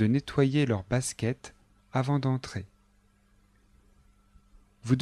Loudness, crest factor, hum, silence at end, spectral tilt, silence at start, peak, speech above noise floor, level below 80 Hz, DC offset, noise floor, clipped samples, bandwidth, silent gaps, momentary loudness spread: -29 LUFS; 20 dB; 50 Hz at -60 dBFS; 0 s; -6.5 dB/octave; 0 s; -12 dBFS; 37 dB; -56 dBFS; under 0.1%; -65 dBFS; under 0.1%; 12.5 kHz; none; 16 LU